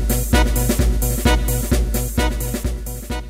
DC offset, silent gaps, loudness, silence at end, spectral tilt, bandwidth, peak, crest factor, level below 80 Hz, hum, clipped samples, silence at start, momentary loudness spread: under 0.1%; none; -20 LUFS; 0 s; -4.5 dB/octave; 16.5 kHz; -2 dBFS; 16 dB; -20 dBFS; none; under 0.1%; 0 s; 8 LU